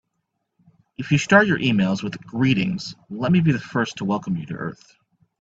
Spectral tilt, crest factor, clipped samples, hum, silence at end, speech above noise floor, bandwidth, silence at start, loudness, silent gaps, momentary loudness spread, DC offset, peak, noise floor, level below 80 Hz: -6 dB/octave; 22 dB; under 0.1%; none; 0.7 s; 55 dB; 8 kHz; 1 s; -21 LUFS; none; 15 LU; under 0.1%; 0 dBFS; -76 dBFS; -56 dBFS